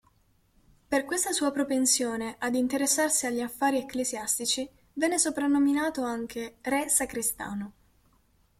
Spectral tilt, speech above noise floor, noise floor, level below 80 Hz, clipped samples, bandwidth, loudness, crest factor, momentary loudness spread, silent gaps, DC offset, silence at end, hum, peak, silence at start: -1.5 dB/octave; 38 dB; -66 dBFS; -62 dBFS; under 0.1%; 16.5 kHz; -27 LUFS; 18 dB; 10 LU; none; under 0.1%; 0.9 s; none; -10 dBFS; 0.9 s